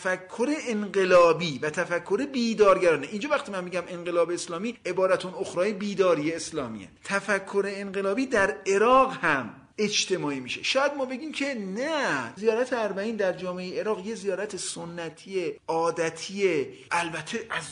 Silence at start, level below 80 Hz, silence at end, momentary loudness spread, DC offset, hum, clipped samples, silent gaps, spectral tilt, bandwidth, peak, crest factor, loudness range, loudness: 0 s; -62 dBFS; 0 s; 11 LU; under 0.1%; none; under 0.1%; none; -4 dB/octave; 10.5 kHz; -8 dBFS; 18 dB; 6 LU; -26 LUFS